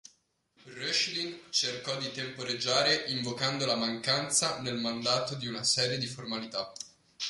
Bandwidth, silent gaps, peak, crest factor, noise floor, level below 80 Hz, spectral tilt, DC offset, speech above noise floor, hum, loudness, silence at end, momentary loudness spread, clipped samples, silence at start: 11.5 kHz; none; -14 dBFS; 18 dB; -70 dBFS; -70 dBFS; -2.5 dB/octave; under 0.1%; 39 dB; none; -30 LUFS; 0 s; 10 LU; under 0.1%; 0.65 s